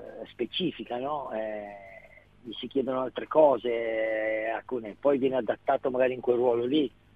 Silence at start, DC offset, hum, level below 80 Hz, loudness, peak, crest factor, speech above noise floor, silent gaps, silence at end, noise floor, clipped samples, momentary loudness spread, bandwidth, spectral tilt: 0 s; under 0.1%; none; -66 dBFS; -28 LUFS; -8 dBFS; 20 dB; 25 dB; none; 0.25 s; -53 dBFS; under 0.1%; 16 LU; 5 kHz; -7.5 dB/octave